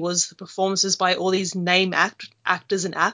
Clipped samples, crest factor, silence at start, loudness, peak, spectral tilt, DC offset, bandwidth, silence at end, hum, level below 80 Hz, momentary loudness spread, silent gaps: under 0.1%; 20 dB; 0 s; -21 LUFS; -2 dBFS; -2.5 dB/octave; under 0.1%; 7.8 kHz; 0 s; none; -72 dBFS; 7 LU; none